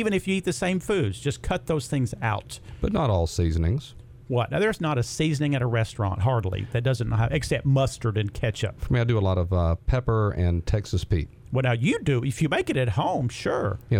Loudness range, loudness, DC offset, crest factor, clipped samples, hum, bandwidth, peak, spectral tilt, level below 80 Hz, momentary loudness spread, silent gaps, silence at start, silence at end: 2 LU; -25 LUFS; under 0.1%; 14 dB; under 0.1%; none; 15 kHz; -10 dBFS; -6.5 dB/octave; -38 dBFS; 5 LU; none; 0 s; 0 s